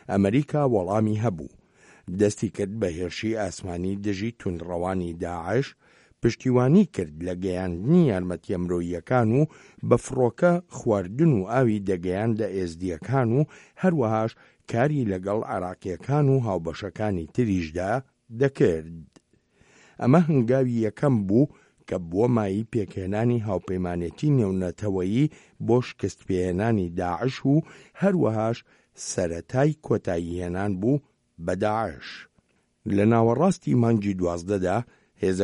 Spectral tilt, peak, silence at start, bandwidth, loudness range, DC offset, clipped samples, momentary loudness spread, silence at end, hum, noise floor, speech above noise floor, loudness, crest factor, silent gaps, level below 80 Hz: -7.5 dB/octave; -4 dBFS; 0.1 s; 11 kHz; 4 LU; under 0.1%; under 0.1%; 10 LU; 0 s; none; -66 dBFS; 42 dB; -25 LUFS; 20 dB; none; -52 dBFS